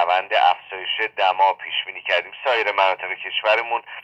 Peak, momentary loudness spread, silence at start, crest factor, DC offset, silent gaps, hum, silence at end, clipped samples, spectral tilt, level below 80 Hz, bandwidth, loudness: -4 dBFS; 7 LU; 0 s; 18 dB; under 0.1%; none; none; 0 s; under 0.1%; -1.5 dB/octave; -76 dBFS; 8 kHz; -20 LUFS